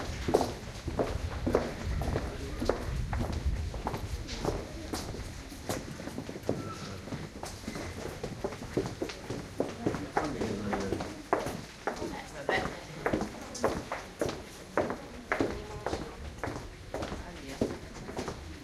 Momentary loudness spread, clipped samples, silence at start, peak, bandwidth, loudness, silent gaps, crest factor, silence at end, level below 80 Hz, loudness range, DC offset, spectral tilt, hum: 9 LU; under 0.1%; 0 s; -10 dBFS; 15.5 kHz; -36 LUFS; none; 26 dB; 0 s; -44 dBFS; 5 LU; under 0.1%; -5.5 dB/octave; none